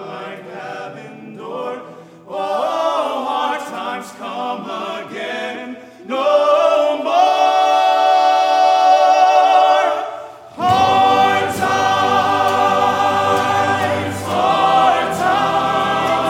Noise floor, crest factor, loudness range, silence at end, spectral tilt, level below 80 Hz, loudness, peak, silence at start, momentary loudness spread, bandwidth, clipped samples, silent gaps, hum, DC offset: -37 dBFS; 14 dB; 10 LU; 0 s; -4 dB/octave; -56 dBFS; -15 LUFS; 0 dBFS; 0 s; 18 LU; 15.5 kHz; under 0.1%; none; none; under 0.1%